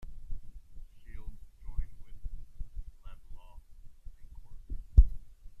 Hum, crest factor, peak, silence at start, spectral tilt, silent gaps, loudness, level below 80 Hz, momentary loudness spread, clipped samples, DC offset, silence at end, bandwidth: none; 26 dB; -6 dBFS; 0 s; -9 dB/octave; none; -31 LUFS; -34 dBFS; 29 LU; under 0.1%; under 0.1%; 0 s; 2.2 kHz